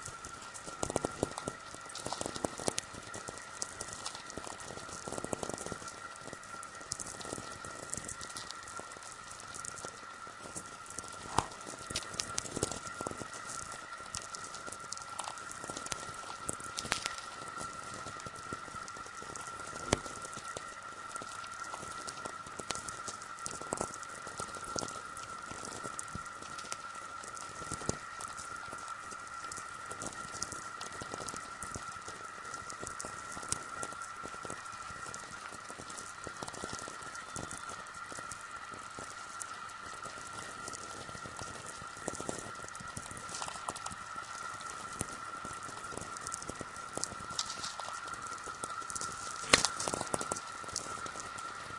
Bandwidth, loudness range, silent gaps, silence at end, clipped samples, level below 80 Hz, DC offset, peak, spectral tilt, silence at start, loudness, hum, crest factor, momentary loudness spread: 11.5 kHz; 4 LU; none; 0 s; under 0.1%; -62 dBFS; under 0.1%; -2 dBFS; -2 dB/octave; 0 s; -40 LUFS; none; 40 dB; 8 LU